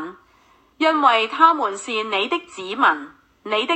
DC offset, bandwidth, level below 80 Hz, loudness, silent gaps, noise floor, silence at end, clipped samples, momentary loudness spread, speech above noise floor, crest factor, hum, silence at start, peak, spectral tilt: under 0.1%; 8.6 kHz; -68 dBFS; -19 LUFS; none; -56 dBFS; 0 s; under 0.1%; 13 LU; 37 dB; 20 dB; none; 0 s; 0 dBFS; -2 dB/octave